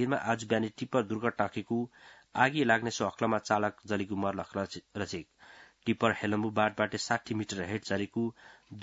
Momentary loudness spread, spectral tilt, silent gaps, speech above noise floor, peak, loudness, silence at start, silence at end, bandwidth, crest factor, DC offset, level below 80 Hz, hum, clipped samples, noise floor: 10 LU; -4 dB/octave; none; 25 dB; -8 dBFS; -32 LUFS; 0 s; 0 s; 7.6 kHz; 24 dB; under 0.1%; -70 dBFS; none; under 0.1%; -56 dBFS